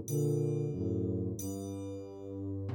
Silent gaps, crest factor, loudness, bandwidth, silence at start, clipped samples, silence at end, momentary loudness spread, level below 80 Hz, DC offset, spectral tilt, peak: none; 14 dB; -36 LUFS; 19 kHz; 0 s; under 0.1%; 0 s; 11 LU; -70 dBFS; under 0.1%; -8 dB/octave; -22 dBFS